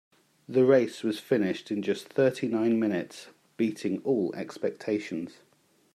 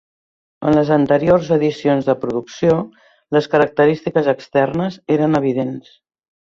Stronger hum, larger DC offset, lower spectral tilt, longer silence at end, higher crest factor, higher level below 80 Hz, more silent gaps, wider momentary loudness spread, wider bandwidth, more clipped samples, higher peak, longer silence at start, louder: neither; neither; about the same, -6.5 dB/octave vs -7.5 dB/octave; about the same, 0.65 s vs 0.7 s; about the same, 20 dB vs 16 dB; second, -78 dBFS vs -50 dBFS; neither; first, 11 LU vs 8 LU; first, 14 kHz vs 7.4 kHz; neither; second, -8 dBFS vs -2 dBFS; about the same, 0.5 s vs 0.6 s; second, -28 LUFS vs -17 LUFS